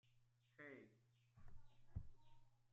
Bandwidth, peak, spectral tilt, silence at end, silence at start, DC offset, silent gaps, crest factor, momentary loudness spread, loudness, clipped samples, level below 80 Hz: 6.8 kHz; -38 dBFS; -6.5 dB/octave; 0 s; 0.05 s; under 0.1%; none; 22 dB; 6 LU; -61 LUFS; under 0.1%; -68 dBFS